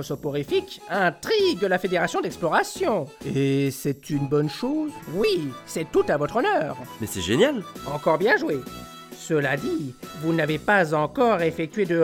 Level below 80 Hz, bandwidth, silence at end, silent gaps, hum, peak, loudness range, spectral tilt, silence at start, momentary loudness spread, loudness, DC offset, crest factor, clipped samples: -54 dBFS; 17.5 kHz; 0 s; none; none; -6 dBFS; 2 LU; -5.5 dB/octave; 0 s; 10 LU; -24 LUFS; under 0.1%; 18 dB; under 0.1%